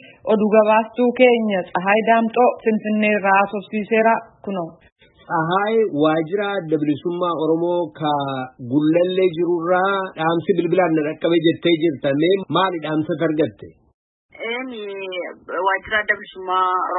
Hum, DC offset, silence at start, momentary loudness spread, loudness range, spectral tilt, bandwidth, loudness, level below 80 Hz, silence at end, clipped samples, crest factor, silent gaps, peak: none; under 0.1%; 0.25 s; 11 LU; 6 LU; -11 dB/octave; 4.1 kHz; -19 LUFS; -62 dBFS; 0 s; under 0.1%; 18 dB; 4.92-4.96 s, 13.94-14.29 s; -2 dBFS